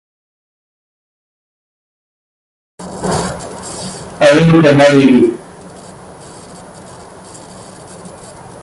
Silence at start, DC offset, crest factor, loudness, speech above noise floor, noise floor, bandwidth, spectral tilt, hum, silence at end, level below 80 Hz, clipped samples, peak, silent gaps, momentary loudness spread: 2.8 s; under 0.1%; 16 dB; -10 LUFS; 27 dB; -34 dBFS; 11.5 kHz; -6 dB/octave; none; 0.3 s; -44 dBFS; under 0.1%; 0 dBFS; none; 27 LU